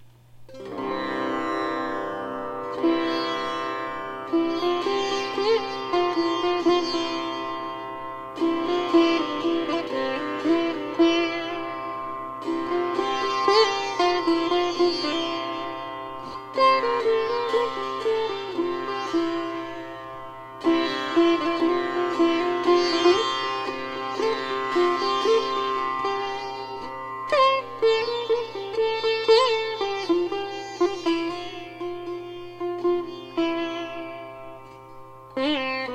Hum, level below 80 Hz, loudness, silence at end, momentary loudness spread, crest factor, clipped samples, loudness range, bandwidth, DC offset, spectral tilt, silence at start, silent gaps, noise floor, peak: none; -60 dBFS; -25 LUFS; 0 s; 14 LU; 18 dB; under 0.1%; 5 LU; 8.8 kHz; under 0.1%; -4 dB/octave; 0 s; none; -46 dBFS; -6 dBFS